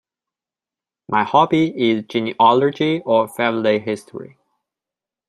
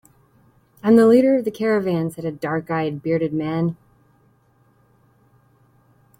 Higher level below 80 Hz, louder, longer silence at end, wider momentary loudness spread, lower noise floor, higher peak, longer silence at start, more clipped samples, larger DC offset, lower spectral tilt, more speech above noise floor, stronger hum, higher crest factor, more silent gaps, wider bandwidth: about the same, -64 dBFS vs -60 dBFS; about the same, -18 LUFS vs -19 LUFS; second, 1.05 s vs 2.45 s; about the same, 11 LU vs 13 LU; first, -89 dBFS vs -59 dBFS; about the same, -2 dBFS vs -4 dBFS; first, 1.1 s vs 0.85 s; neither; neither; second, -6.5 dB/octave vs -8 dB/octave; first, 72 dB vs 40 dB; neither; about the same, 18 dB vs 18 dB; neither; second, 13.5 kHz vs 16 kHz